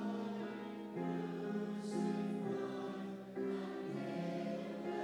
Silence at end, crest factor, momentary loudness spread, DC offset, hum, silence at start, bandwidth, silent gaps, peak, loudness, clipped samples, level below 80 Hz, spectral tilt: 0 s; 14 dB; 6 LU; under 0.1%; none; 0 s; 12 kHz; none; -28 dBFS; -42 LUFS; under 0.1%; -80 dBFS; -7 dB/octave